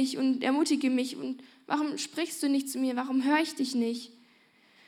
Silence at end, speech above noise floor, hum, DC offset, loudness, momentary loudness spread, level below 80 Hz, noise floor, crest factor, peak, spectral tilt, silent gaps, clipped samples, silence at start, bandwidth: 0.75 s; 34 dB; none; under 0.1%; -29 LUFS; 11 LU; under -90 dBFS; -63 dBFS; 16 dB; -14 dBFS; -3 dB/octave; none; under 0.1%; 0 s; 16 kHz